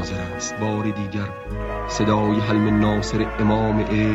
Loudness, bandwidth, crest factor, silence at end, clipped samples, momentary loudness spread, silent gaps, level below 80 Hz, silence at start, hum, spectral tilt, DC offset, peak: -22 LUFS; 8 kHz; 14 dB; 0 s; under 0.1%; 9 LU; none; -34 dBFS; 0 s; none; -6 dB/octave; under 0.1%; -6 dBFS